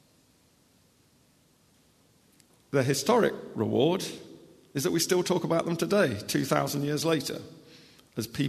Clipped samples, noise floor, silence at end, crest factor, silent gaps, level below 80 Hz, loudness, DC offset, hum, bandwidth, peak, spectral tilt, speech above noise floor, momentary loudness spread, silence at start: under 0.1%; -64 dBFS; 0 s; 22 dB; none; -66 dBFS; -28 LUFS; under 0.1%; none; 13.5 kHz; -8 dBFS; -4.5 dB/octave; 37 dB; 13 LU; 2.7 s